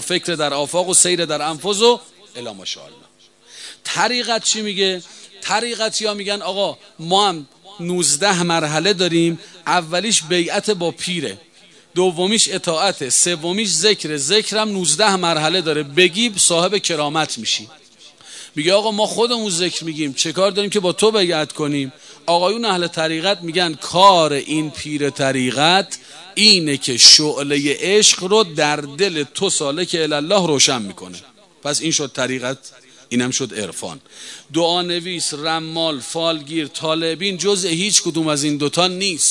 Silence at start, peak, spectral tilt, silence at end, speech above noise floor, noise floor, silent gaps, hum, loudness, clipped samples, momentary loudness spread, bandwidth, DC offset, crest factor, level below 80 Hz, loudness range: 0 s; 0 dBFS; -2.5 dB/octave; 0 s; 29 dB; -47 dBFS; none; none; -16 LUFS; under 0.1%; 13 LU; 12 kHz; under 0.1%; 18 dB; -64 dBFS; 8 LU